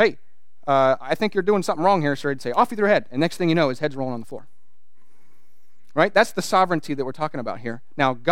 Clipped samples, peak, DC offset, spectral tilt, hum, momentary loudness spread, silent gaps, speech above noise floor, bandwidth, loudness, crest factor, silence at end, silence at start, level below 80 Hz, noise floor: under 0.1%; -2 dBFS; 2%; -5.5 dB/octave; none; 11 LU; none; 49 dB; 16.5 kHz; -22 LUFS; 20 dB; 0 s; 0 s; -72 dBFS; -70 dBFS